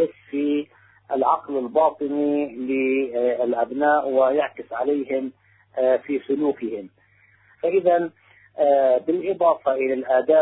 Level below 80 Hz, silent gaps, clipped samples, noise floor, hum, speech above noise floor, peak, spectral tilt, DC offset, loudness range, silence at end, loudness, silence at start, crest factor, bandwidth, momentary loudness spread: -70 dBFS; none; under 0.1%; -58 dBFS; none; 37 dB; -6 dBFS; -10 dB/octave; under 0.1%; 3 LU; 0 s; -22 LUFS; 0 s; 16 dB; 4 kHz; 9 LU